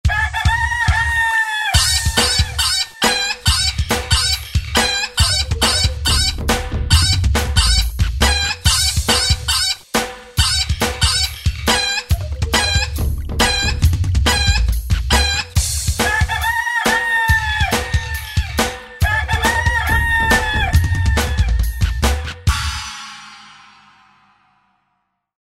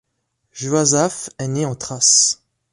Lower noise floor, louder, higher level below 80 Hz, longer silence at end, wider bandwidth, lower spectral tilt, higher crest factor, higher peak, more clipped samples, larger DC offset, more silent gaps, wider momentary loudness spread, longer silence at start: about the same, -69 dBFS vs -72 dBFS; about the same, -16 LUFS vs -16 LUFS; first, -22 dBFS vs -58 dBFS; first, 1.95 s vs 0.4 s; first, 16.5 kHz vs 11.5 kHz; about the same, -3 dB/octave vs -3 dB/octave; about the same, 16 dB vs 18 dB; about the same, 0 dBFS vs -2 dBFS; neither; neither; neither; second, 6 LU vs 15 LU; second, 0.05 s vs 0.55 s